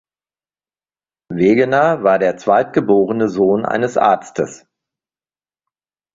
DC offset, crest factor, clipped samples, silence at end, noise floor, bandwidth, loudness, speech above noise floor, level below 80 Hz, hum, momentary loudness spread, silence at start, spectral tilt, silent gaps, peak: under 0.1%; 16 dB; under 0.1%; 1.6 s; under -90 dBFS; 7.8 kHz; -15 LUFS; over 76 dB; -56 dBFS; none; 8 LU; 1.3 s; -6.5 dB/octave; none; -2 dBFS